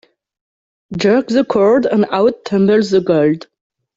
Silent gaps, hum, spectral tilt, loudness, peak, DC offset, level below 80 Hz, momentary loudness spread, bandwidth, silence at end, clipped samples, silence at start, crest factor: none; none; -7 dB/octave; -14 LUFS; -2 dBFS; under 0.1%; -56 dBFS; 5 LU; 7.8 kHz; 0.55 s; under 0.1%; 0.9 s; 14 dB